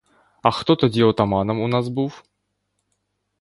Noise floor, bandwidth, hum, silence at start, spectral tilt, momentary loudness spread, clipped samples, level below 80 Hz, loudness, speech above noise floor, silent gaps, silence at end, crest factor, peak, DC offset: -74 dBFS; 11.5 kHz; 50 Hz at -45 dBFS; 0.45 s; -7.5 dB/octave; 8 LU; under 0.1%; -50 dBFS; -20 LUFS; 55 dB; none; 1.2 s; 22 dB; 0 dBFS; under 0.1%